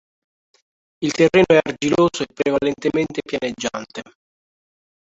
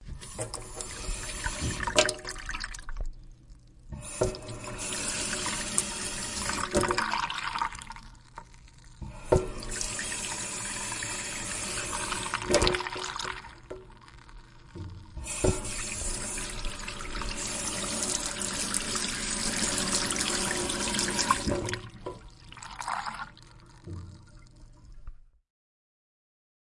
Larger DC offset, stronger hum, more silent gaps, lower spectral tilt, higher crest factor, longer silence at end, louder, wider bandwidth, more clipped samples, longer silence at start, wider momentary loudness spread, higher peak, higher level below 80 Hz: neither; neither; neither; first, -5 dB/octave vs -2.5 dB/octave; second, 18 dB vs 30 dB; second, 1.1 s vs 1.5 s; first, -19 LUFS vs -30 LUFS; second, 8 kHz vs 11.5 kHz; neither; first, 1 s vs 0 s; second, 12 LU vs 18 LU; about the same, -2 dBFS vs -4 dBFS; second, -52 dBFS vs -44 dBFS